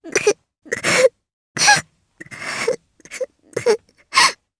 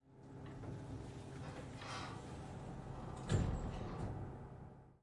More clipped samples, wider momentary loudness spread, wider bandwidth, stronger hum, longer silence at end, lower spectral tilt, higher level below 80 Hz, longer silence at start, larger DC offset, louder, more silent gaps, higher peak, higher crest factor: neither; first, 17 LU vs 14 LU; about the same, 11 kHz vs 11.5 kHz; neither; first, 0.25 s vs 0.05 s; second, -1 dB/octave vs -6.5 dB/octave; second, -60 dBFS vs -54 dBFS; about the same, 0.05 s vs 0.05 s; neither; first, -18 LUFS vs -47 LUFS; first, 1.33-1.55 s vs none; first, 0 dBFS vs -24 dBFS; about the same, 20 dB vs 22 dB